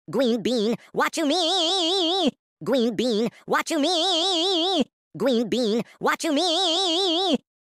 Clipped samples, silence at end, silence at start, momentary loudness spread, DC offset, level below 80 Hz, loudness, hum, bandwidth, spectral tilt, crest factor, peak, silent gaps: under 0.1%; 0.25 s; 0.1 s; 5 LU; under 0.1%; -68 dBFS; -22 LUFS; none; 16 kHz; -3 dB/octave; 12 dB; -10 dBFS; 2.39-2.57 s, 4.93-5.11 s